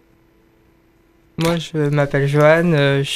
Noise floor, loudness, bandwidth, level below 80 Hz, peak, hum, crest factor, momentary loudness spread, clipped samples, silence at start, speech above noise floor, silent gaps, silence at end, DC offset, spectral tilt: -55 dBFS; -16 LUFS; 15 kHz; -46 dBFS; -2 dBFS; none; 16 dB; 8 LU; under 0.1%; 1.4 s; 39 dB; none; 0 s; under 0.1%; -6.5 dB/octave